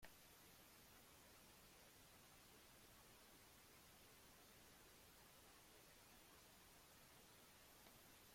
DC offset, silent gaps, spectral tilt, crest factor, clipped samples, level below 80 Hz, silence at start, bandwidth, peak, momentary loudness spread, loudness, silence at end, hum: under 0.1%; none; -2.5 dB/octave; 24 dB; under 0.1%; -80 dBFS; 0 s; 16.5 kHz; -44 dBFS; 1 LU; -66 LUFS; 0 s; none